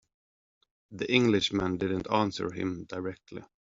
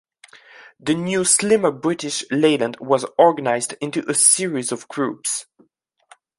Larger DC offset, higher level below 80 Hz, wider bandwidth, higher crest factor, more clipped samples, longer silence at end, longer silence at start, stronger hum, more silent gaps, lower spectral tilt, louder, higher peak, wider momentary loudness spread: neither; first, -60 dBFS vs -66 dBFS; second, 7.8 kHz vs 12 kHz; about the same, 22 dB vs 20 dB; neither; second, 0.25 s vs 0.95 s; first, 0.9 s vs 0.6 s; neither; neither; about the same, -4 dB/octave vs -3 dB/octave; second, -29 LUFS vs -19 LUFS; second, -10 dBFS vs 0 dBFS; first, 17 LU vs 11 LU